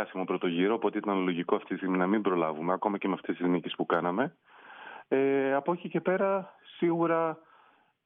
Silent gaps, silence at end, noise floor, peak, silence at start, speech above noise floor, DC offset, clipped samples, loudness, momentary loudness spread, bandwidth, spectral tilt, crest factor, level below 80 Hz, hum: none; 0.65 s; -63 dBFS; -10 dBFS; 0 s; 34 dB; under 0.1%; under 0.1%; -29 LUFS; 7 LU; 3.9 kHz; -5 dB/octave; 18 dB; -82 dBFS; none